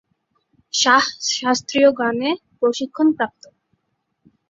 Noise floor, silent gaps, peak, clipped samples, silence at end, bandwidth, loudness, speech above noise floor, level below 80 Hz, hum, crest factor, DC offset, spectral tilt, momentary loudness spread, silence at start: -73 dBFS; none; -2 dBFS; under 0.1%; 1.25 s; 7.8 kHz; -18 LUFS; 54 dB; -64 dBFS; none; 20 dB; under 0.1%; -2 dB/octave; 9 LU; 0.75 s